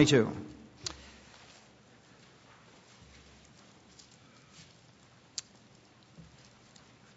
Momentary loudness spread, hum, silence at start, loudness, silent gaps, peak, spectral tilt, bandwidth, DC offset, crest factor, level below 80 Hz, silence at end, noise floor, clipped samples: 17 LU; none; 0 s; -34 LUFS; none; -10 dBFS; -5 dB/octave; 7.6 kHz; under 0.1%; 28 dB; -66 dBFS; 6.25 s; -60 dBFS; under 0.1%